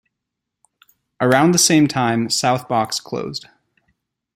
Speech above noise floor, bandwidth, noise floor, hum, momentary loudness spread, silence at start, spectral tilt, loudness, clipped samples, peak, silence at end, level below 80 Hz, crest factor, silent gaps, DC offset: 64 dB; 16.5 kHz; -81 dBFS; none; 14 LU; 1.2 s; -4 dB/octave; -17 LUFS; under 0.1%; -2 dBFS; 0.95 s; -60 dBFS; 18 dB; none; under 0.1%